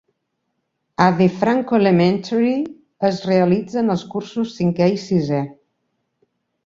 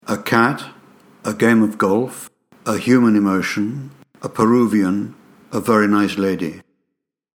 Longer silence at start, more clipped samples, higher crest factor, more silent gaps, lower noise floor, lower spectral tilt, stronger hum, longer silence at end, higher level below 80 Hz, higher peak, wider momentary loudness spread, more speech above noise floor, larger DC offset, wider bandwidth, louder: first, 1 s vs 0.05 s; neither; about the same, 18 dB vs 18 dB; neither; second, -73 dBFS vs -77 dBFS; first, -7.5 dB/octave vs -6 dB/octave; neither; first, 1.15 s vs 0.8 s; about the same, -58 dBFS vs -62 dBFS; about the same, -2 dBFS vs 0 dBFS; second, 9 LU vs 17 LU; second, 56 dB vs 61 dB; neither; second, 7.6 kHz vs 18.5 kHz; about the same, -18 LUFS vs -17 LUFS